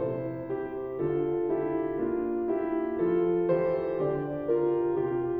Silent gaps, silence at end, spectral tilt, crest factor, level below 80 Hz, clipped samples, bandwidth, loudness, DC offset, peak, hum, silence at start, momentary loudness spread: none; 0 s; -11.5 dB/octave; 14 dB; -58 dBFS; under 0.1%; 3.4 kHz; -29 LUFS; under 0.1%; -14 dBFS; none; 0 s; 8 LU